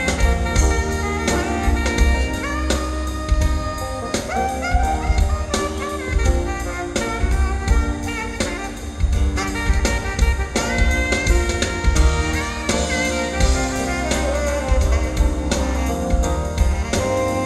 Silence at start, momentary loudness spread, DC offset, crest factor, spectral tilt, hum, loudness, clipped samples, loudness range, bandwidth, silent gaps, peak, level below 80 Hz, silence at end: 0 s; 5 LU; under 0.1%; 16 dB; -4.5 dB/octave; none; -21 LUFS; under 0.1%; 2 LU; 13 kHz; none; -4 dBFS; -22 dBFS; 0 s